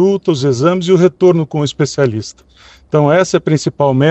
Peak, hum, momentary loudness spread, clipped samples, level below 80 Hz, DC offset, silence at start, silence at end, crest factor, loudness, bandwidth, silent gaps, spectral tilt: 0 dBFS; none; 6 LU; under 0.1%; -50 dBFS; under 0.1%; 0 s; 0 s; 12 dB; -13 LUFS; 8.4 kHz; none; -6.5 dB/octave